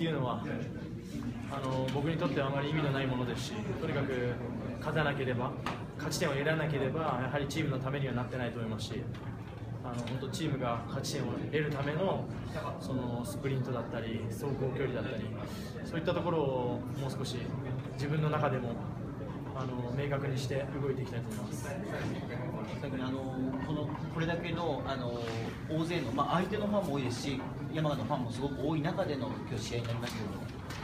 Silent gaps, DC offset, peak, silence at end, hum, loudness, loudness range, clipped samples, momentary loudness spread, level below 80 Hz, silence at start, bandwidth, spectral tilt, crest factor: none; under 0.1%; -16 dBFS; 0 s; none; -35 LUFS; 3 LU; under 0.1%; 7 LU; -54 dBFS; 0 s; 15.5 kHz; -6.5 dB/octave; 18 dB